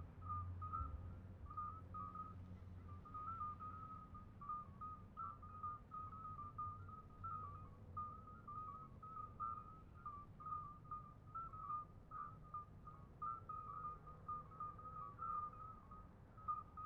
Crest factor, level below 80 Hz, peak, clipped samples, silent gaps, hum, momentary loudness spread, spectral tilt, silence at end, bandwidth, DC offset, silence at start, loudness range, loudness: 16 dB; -64 dBFS; -36 dBFS; under 0.1%; none; none; 9 LU; -8 dB/octave; 0 s; 6.2 kHz; under 0.1%; 0 s; 2 LU; -52 LUFS